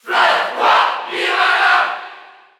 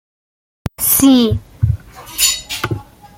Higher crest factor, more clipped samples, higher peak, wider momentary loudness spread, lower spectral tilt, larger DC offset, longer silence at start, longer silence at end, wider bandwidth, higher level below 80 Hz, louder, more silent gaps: about the same, 14 dB vs 16 dB; neither; about the same, -2 dBFS vs 0 dBFS; second, 9 LU vs 18 LU; second, -0.5 dB/octave vs -4 dB/octave; neither; second, 0.05 s vs 0.65 s; about the same, 0.35 s vs 0.35 s; about the same, 17.5 kHz vs 17 kHz; second, -74 dBFS vs -36 dBFS; about the same, -14 LUFS vs -14 LUFS; neither